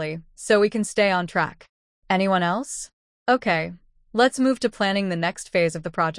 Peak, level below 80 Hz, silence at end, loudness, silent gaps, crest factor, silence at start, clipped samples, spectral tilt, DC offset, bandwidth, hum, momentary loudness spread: -6 dBFS; -58 dBFS; 0 s; -22 LUFS; 1.69-2.02 s, 2.93-3.26 s; 16 dB; 0 s; under 0.1%; -4.5 dB/octave; under 0.1%; 12 kHz; none; 12 LU